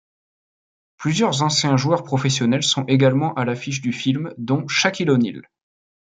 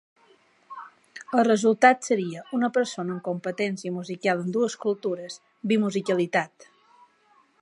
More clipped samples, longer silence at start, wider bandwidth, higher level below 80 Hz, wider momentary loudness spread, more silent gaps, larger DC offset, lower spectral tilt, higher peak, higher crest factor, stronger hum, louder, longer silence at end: neither; first, 1 s vs 0.7 s; second, 9.4 kHz vs 11.5 kHz; first, -62 dBFS vs -78 dBFS; second, 8 LU vs 21 LU; neither; neither; about the same, -4.5 dB/octave vs -5 dB/octave; about the same, -4 dBFS vs -2 dBFS; second, 18 dB vs 24 dB; neither; first, -20 LUFS vs -25 LUFS; second, 0.75 s vs 1 s